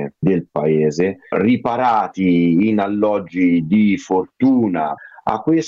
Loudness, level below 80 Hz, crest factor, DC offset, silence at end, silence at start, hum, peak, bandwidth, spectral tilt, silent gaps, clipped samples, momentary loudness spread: -17 LUFS; -54 dBFS; 14 dB; under 0.1%; 0 s; 0 s; none; -4 dBFS; 7.4 kHz; -7.5 dB/octave; none; under 0.1%; 6 LU